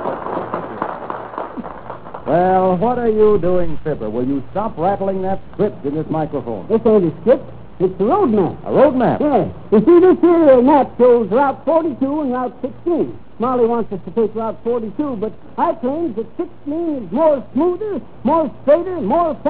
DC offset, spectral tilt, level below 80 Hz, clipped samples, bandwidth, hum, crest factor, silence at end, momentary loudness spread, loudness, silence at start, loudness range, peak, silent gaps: 2%; -12 dB/octave; -44 dBFS; under 0.1%; 4 kHz; none; 14 dB; 0 s; 13 LU; -17 LUFS; 0 s; 8 LU; -2 dBFS; none